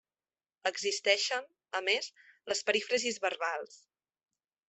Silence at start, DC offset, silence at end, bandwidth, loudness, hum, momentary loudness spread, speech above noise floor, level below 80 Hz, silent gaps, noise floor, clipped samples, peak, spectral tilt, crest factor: 0.65 s; under 0.1%; 0.9 s; 8.4 kHz; -32 LUFS; none; 12 LU; over 57 dB; -84 dBFS; none; under -90 dBFS; under 0.1%; -10 dBFS; 0 dB/octave; 24 dB